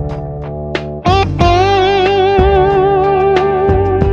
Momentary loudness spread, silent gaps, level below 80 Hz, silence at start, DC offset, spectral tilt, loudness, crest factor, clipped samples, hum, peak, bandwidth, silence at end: 11 LU; none; -24 dBFS; 0 s; under 0.1%; -7 dB/octave; -12 LUFS; 12 dB; under 0.1%; none; 0 dBFS; 7 kHz; 0 s